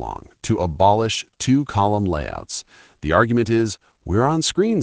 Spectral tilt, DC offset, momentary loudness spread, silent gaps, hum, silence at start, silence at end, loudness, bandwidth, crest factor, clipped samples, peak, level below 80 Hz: -5.5 dB/octave; under 0.1%; 14 LU; none; none; 0 s; 0 s; -20 LUFS; 10 kHz; 18 dB; under 0.1%; -2 dBFS; -42 dBFS